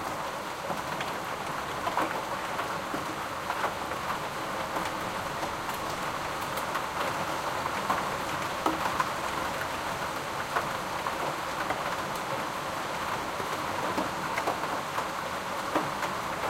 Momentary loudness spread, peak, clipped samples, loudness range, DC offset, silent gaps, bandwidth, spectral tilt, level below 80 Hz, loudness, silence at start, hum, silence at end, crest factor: 3 LU; -12 dBFS; under 0.1%; 2 LU; under 0.1%; none; 16.5 kHz; -3.5 dB/octave; -56 dBFS; -32 LUFS; 0 s; none; 0 s; 20 dB